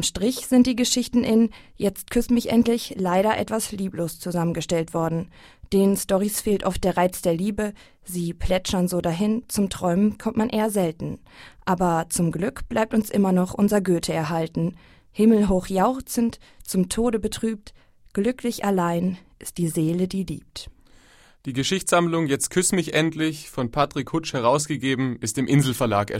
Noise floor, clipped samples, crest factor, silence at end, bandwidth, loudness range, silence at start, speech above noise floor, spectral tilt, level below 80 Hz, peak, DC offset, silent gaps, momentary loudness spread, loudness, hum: -53 dBFS; under 0.1%; 16 dB; 0 s; 16 kHz; 4 LU; 0 s; 30 dB; -5 dB/octave; -44 dBFS; -6 dBFS; under 0.1%; none; 9 LU; -23 LUFS; none